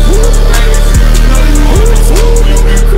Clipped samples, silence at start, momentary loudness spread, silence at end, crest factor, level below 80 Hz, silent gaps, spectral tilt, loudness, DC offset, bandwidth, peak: 0.9%; 0 s; 1 LU; 0 s; 4 dB; -4 dBFS; none; -5 dB/octave; -9 LUFS; 3%; 16 kHz; 0 dBFS